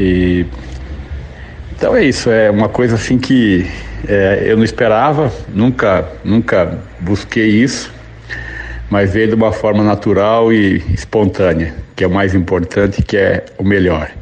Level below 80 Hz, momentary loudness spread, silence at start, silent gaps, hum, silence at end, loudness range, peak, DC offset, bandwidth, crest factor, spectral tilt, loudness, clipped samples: -30 dBFS; 14 LU; 0 s; none; none; 0 s; 3 LU; -2 dBFS; under 0.1%; 9.4 kHz; 12 dB; -6.5 dB/octave; -13 LUFS; under 0.1%